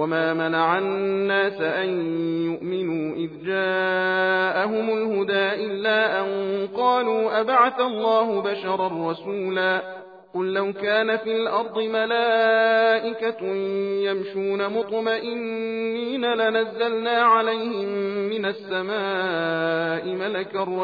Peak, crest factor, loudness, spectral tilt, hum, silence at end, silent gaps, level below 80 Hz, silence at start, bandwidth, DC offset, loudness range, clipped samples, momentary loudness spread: -6 dBFS; 18 dB; -23 LUFS; -7.5 dB/octave; none; 0 s; none; -78 dBFS; 0 s; 5 kHz; under 0.1%; 3 LU; under 0.1%; 8 LU